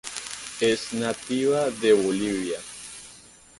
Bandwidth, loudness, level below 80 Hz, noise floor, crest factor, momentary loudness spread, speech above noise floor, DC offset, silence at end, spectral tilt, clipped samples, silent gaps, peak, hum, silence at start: 11.5 kHz; -25 LUFS; -62 dBFS; -50 dBFS; 18 dB; 18 LU; 26 dB; under 0.1%; 0.4 s; -4 dB/octave; under 0.1%; none; -6 dBFS; none; 0.05 s